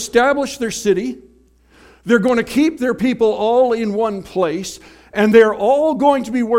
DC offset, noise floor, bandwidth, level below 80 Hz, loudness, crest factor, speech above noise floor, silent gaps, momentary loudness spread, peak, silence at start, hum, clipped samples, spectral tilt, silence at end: under 0.1%; -51 dBFS; 16 kHz; -50 dBFS; -16 LUFS; 16 dB; 36 dB; none; 14 LU; 0 dBFS; 0 s; none; under 0.1%; -5 dB/octave; 0 s